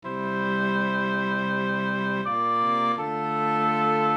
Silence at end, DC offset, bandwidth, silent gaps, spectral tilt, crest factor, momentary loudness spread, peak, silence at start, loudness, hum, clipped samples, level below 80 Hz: 0 s; under 0.1%; 8.6 kHz; none; -7 dB/octave; 12 dB; 4 LU; -12 dBFS; 0.05 s; -25 LUFS; none; under 0.1%; -72 dBFS